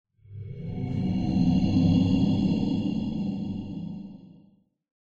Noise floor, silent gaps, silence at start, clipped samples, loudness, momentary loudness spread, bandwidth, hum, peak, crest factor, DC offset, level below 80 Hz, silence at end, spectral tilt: -60 dBFS; none; 0.3 s; under 0.1%; -26 LUFS; 16 LU; 7.2 kHz; none; -10 dBFS; 16 dB; under 0.1%; -44 dBFS; 0.75 s; -8.5 dB/octave